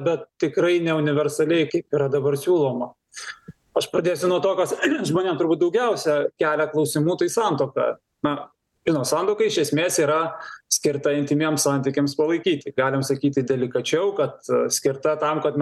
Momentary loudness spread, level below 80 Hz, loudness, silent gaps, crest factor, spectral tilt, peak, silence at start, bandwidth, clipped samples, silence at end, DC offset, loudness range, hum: 6 LU; -66 dBFS; -22 LUFS; none; 14 dB; -4.5 dB/octave; -8 dBFS; 0 s; 12.5 kHz; under 0.1%; 0 s; under 0.1%; 2 LU; none